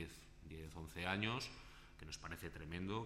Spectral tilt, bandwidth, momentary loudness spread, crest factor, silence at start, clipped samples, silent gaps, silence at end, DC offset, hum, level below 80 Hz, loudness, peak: -4.5 dB/octave; 16 kHz; 18 LU; 22 dB; 0 s; under 0.1%; none; 0 s; under 0.1%; none; -60 dBFS; -46 LUFS; -24 dBFS